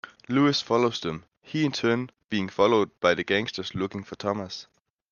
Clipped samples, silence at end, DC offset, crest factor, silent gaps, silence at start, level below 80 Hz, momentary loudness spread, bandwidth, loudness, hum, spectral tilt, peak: under 0.1%; 0.5 s; under 0.1%; 20 dB; 1.37-1.41 s, 2.24-2.29 s; 0.05 s; -64 dBFS; 11 LU; 7.2 kHz; -26 LUFS; none; -5.5 dB/octave; -6 dBFS